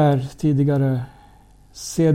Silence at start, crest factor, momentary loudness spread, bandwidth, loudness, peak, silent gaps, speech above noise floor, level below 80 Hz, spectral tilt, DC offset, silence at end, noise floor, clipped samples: 0 s; 14 dB; 14 LU; 14.5 kHz; -21 LUFS; -6 dBFS; none; 31 dB; -48 dBFS; -7.5 dB/octave; under 0.1%; 0 s; -49 dBFS; under 0.1%